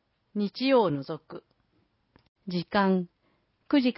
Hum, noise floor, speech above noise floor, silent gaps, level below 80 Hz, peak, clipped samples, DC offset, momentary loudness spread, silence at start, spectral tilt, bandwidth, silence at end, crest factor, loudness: none; -71 dBFS; 45 dB; 2.28-2.35 s; -68 dBFS; -12 dBFS; under 0.1%; under 0.1%; 20 LU; 0.35 s; -10.5 dB/octave; 5.8 kHz; 0.05 s; 18 dB; -27 LUFS